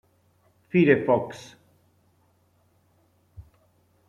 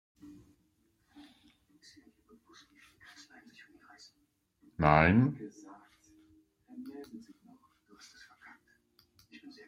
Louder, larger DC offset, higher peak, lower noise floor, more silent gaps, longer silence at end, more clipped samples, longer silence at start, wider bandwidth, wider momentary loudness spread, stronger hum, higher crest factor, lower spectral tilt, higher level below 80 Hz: first, -22 LUFS vs -27 LUFS; neither; first, -4 dBFS vs -8 dBFS; second, -65 dBFS vs -76 dBFS; neither; first, 0.7 s vs 0.2 s; neither; second, 0.75 s vs 4.8 s; second, 10 kHz vs 11.5 kHz; second, 24 LU vs 31 LU; neither; second, 24 dB vs 30 dB; about the same, -8 dB/octave vs -7.5 dB/octave; second, -64 dBFS vs -58 dBFS